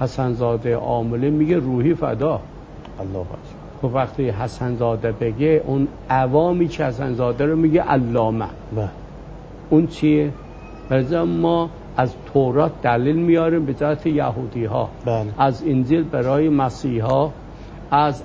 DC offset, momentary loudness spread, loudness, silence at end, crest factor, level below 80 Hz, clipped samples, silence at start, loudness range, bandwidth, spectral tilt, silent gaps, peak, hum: under 0.1%; 13 LU; -20 LUFS; 0 s; 16 dB; -40 dBFS; under 0.1%; 0 s; 3 LU; 8 kHz; -8.5 dB/octave; none; -2 dBFS; none